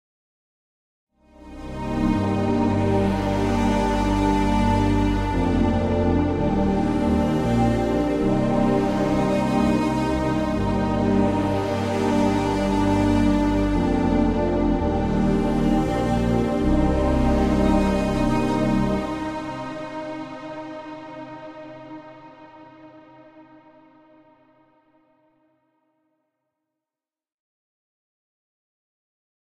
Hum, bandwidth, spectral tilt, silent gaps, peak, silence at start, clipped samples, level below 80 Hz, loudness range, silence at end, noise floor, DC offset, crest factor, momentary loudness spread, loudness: none; 13 kHz; -7.5 dB/octave; none; -8 dBFS; 1.4 s; under 0.1%; -32 dBFS; 12 LU; 6.05 s; under -90 dBFS; under 0.1%; 14 dB; 13 LU; -22 LUFS